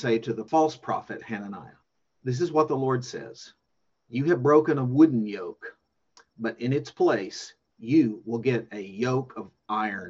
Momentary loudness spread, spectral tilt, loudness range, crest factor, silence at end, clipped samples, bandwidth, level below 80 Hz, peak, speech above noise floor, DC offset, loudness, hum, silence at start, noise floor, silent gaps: 19 LU; -7 dB/octave; 5 LU; 20 dB; 0 s; under 0.1%; 7.6 kHz; -70 dBFS; -6 dBFS; 51 dB; under 0.1%; -26 LUFS; none; 0 s; -77 dBFS; none